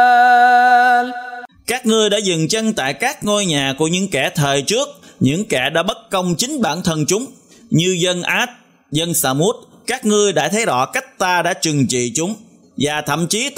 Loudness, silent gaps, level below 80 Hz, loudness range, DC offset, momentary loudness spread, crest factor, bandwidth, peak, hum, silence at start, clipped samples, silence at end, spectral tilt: -16 LUFS; none; -52 dBFS; 3 LU; under 0.1%; 11 LU; 16 dB; 16 kHz; -2 dBFS; none; 0 s; under 0.1%; 0 s; -3.5 dB/octave